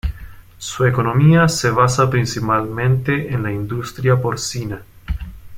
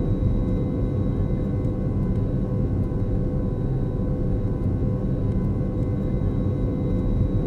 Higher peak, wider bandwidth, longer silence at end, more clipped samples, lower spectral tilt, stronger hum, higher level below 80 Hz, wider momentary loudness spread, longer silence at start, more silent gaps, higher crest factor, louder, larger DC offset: first, -2 dBFS vs -10 dBFS; first, 16 kHz vs 4.3 kHz; about the same, 0 s vs 0 s; neither; second, -6 dB/octave vs -11 dB/octave; neither; second, -34 dBFS vs -28 dBFS; first, 16 LU vs 2 LU; about the same, 0.05 s vs 0 s; neither; about the same, 16 dB vs 12 dB; first, -17 LUFS vs -25 LUFS; second, under 0.1% vs 0.1%